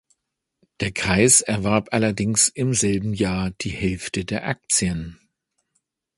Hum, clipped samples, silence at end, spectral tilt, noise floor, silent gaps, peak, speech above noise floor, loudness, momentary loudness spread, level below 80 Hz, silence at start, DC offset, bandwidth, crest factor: none; under 0.1%; 1.05 s; -3.5 dB/octave; -76 dBFS; none; -2 dBFS; 55 dB; -20 LUFS; 12 LU; -44 dBFS; 0.8 s; under 0.1%; 12 kHz; 22 dB